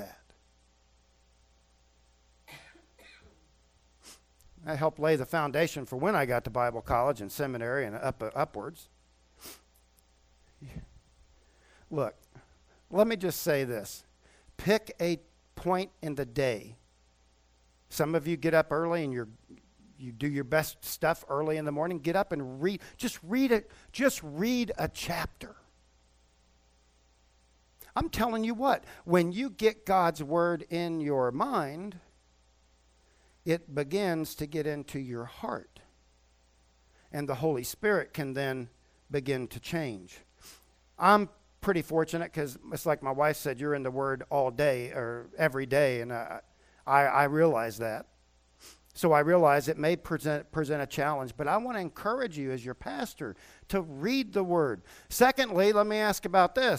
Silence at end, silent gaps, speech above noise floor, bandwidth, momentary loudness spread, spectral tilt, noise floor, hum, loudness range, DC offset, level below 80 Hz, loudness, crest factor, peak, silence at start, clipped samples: 0 s; none; 36 dB; 16.5 kHz; 14 LU; -5.5 dB/octave; -65 dBFS; none; 8 LU; under 0.1%; -58 dBFS; -30 LUFS; 24 dB; -8 dBFS; 0 s; under 0.1%